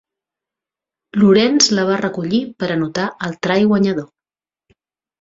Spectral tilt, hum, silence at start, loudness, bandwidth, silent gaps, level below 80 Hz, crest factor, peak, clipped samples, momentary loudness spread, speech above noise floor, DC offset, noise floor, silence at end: -4.5 dB/octave; none; 1.15 s; -16 LUFS; 7.8 kHz; none; -58 dBFS; 16 dB; -2 dBFS; under 0.1%; 11 LU; over 74 dB; under 0.1%; under -90 dBFS; 1.15 s